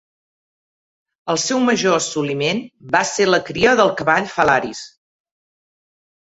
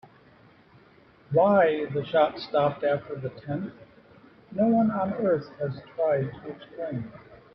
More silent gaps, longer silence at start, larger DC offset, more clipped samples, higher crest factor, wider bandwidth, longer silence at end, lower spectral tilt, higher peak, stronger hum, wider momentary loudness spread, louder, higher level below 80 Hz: neither; about the same, 1.25 s vs 1.3 s; neither; neither; about the same, 18 dB vs 18 dB; first, 8.2 kHz vs 5.8 kHz; first, 1.35 s vs 0.2 s; second, -3.5 dB/octave vs -10 dB/octave; first, -2 dBFS vs -8 dBFS; neither; second, 8 LU vs 15 LU; first, -17 LUFS vs -26 LUFS; first, -54 dBFS vs -64 dBFS